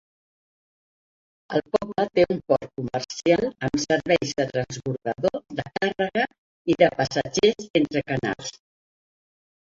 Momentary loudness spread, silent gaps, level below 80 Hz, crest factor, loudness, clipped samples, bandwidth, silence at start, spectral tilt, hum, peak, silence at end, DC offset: 9 LU; 6.38-6.65 s, 7.70-7.74 s; -56 dBFS; 22 dB; -24 LUFS; under 0.1%; 7.8 kHz; 1.5 s; -5 dB/octave; none; -4 dBFS; 1.15 s; under 0.1%